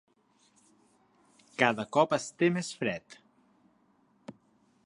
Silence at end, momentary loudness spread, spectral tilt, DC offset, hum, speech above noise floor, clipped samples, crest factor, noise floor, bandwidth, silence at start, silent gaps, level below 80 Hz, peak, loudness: 0.55 s; 24 LU; -5 dB/octave; under 0.1%; none; 39 dB; under 0.1%; 26 dB; -68 dBFS; 11.5 kHz; 1.6 s; none; -76 dBFS; -8 dBFS; -29 LUFS